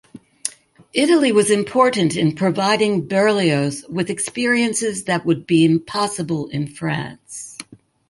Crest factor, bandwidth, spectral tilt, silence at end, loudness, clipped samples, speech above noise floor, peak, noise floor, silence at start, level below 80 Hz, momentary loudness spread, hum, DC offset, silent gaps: 18 dB; 11.5 kHz; -4.5 dB/octave; 0.45 s; -18 LUFS; under 0.1%; 23 dB; -2 dBFS; -41 dBFS; 0.15 s; -60 dBFS; 13 LU; none; under 0.1%; none